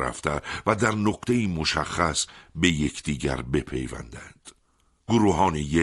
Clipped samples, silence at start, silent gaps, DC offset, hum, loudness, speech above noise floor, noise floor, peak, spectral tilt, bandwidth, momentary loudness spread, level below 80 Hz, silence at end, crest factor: under 0.1%; 0 s; none; under 0.1%; none; -25 LUFS; 41 dB; -66 dBFS; -4 dBFS; -4.5 dB/octave; 12 kHz; 13 LU; -42 dBFS; 0 s; 22 dB